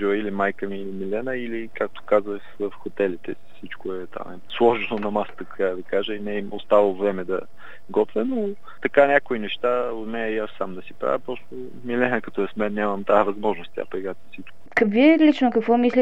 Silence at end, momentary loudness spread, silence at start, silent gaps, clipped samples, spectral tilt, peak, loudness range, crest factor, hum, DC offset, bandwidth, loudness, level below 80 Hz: 0 s; 16 LU; 0 s; none; under 0.1%; -7 dB/octave; -2 dBFS; 5 LU; 22 dB; none; 2%; 8 kHz; -23 LUFS; -64 dBFS